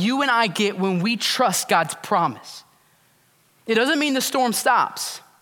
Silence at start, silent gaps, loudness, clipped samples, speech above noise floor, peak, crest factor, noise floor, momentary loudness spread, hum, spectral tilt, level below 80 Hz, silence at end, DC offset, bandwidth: 0 s; none; -20 LUFS; under 0.1%; 39 dB; -4 dBFS; 18 dB; -60 dBFS; 11 LU; none; -3 dB/octave; -76 dBFS; 0.2 s; under 0.1%; 18 kHz